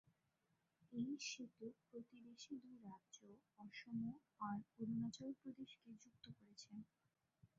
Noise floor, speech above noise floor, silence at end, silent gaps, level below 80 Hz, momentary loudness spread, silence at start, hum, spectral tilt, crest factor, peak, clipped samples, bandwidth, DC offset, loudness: -87 dBFS; 34 dB; 0.1 s; none; -88 dBFS; 16 LU; 0.8 s; none; -4.5 dB/octave; 16 dB; -36 dBFS; under 0.1%; 7.4 kHz; under 0.1%; -53 LUFS